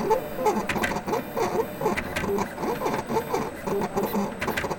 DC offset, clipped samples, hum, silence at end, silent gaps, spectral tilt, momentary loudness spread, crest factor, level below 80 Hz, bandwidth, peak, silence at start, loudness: under 0.1%; under 0.1%; none; 0 s; none; -5 dB/octave; 3 LU; 16 dB; -48 dBFS; 17.5 kHz; -10 dBFS; 0 s; -27 LUFS